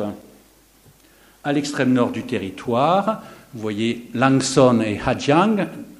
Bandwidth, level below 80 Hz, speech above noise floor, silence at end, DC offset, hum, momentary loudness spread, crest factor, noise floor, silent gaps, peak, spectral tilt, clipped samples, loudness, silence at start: 15 kHz; -52 dBFS; 33 dB; 0.05 s; under 0.1%; none; 15 LU; 20 dB; -53 dBFS; none; 0 dBFS; -5.5 dB/octave; under 0.1%; -20 LUFS; 0 s